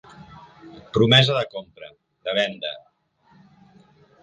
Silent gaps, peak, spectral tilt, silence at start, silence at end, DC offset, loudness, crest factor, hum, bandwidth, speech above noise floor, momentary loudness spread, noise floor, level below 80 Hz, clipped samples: none; -2 dBFS; -5.5 dB/octave; 0.3 s; 1.45 s; under 0.1%; -20 LUFS; 22 dB; none; 9.4 kHz; 38 dB; 22 LU; -59 dBFS; -56 dBFS; under 0.1%